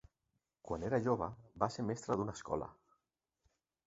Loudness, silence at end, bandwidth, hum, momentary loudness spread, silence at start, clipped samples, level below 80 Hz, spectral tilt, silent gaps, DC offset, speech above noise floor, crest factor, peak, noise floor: -39 LUFS; 1.15 s; 8 kHz; none; 9 LU; 0.65 s; under 0.1%; -62 dBFS; -6.5 dB/octave; none; under 0.1%; 50 dB; 22 dB; -18 dBFS; -87 dBFS